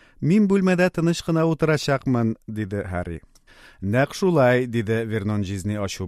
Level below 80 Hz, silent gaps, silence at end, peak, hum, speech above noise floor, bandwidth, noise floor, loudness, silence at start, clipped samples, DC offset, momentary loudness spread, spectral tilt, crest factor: -50 dBFS; none; 0 s; -6 dBFS; none; 29 dB; 15 kHz; -50 dBFS; -22 LUFS; 0.2 s; under 0.1%; under 0.1%; 11 LU; -6.5 dB/octave; 16 dB